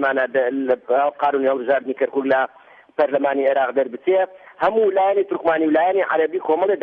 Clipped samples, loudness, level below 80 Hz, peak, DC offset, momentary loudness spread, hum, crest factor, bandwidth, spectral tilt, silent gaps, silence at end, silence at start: under 0.1%; -19 LUFS; -66 dBFS; -6 dBFS; under 0.1%; 5 LU; none; 14 dB; 4.8 kHz; -7.5 dB/octave; none; 0 s; 0 s